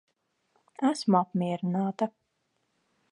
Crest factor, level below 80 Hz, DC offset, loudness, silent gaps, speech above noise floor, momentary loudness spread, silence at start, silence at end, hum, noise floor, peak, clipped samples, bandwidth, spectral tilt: 20 dB; -82 dBFS; under 0.1%; -28 LUFS; none; 50 dB; 7 LU; 0.8 s; 1.05 s; none; -77 dBFS; -10 dBFS; under 0.1%; 11.5 kHz; -7 dB/octave